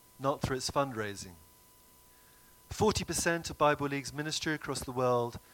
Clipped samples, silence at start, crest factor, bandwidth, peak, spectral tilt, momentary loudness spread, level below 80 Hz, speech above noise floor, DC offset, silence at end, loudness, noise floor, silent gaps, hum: under 0.1%; 0.2 s; 20 dB; 17.5 kHz; -14 dBFS; -4 dB/octave; 9 LU; -54 dBFS; 28 dB; under 0.1%; 0.15 s; -32 LUFS; -60 dBFS; none; none